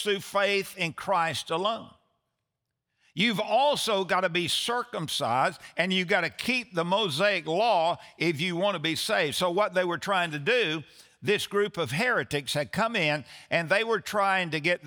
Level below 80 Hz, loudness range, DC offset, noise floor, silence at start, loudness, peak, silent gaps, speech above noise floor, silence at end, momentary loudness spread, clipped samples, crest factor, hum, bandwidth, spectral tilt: -70 dBFS; 2 LU; under 0.1%; -84 dBFS; 0 s; -27 LUFS; -8 dBFS; none; 57 dB; 0 s; 5 LU; under 0.1%; 18 dB; none; over 20 kHz; -4 dB/octave